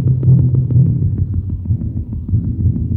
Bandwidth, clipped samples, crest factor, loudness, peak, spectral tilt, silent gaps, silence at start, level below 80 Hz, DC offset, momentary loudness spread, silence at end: 1.2 kHz; under 0.1%; 12 dB; -16 LUFS; -2 dBFS; -15 dB/octave; none; 0 s; -26 dBFS; under 0.1%; 9 LU; 0 s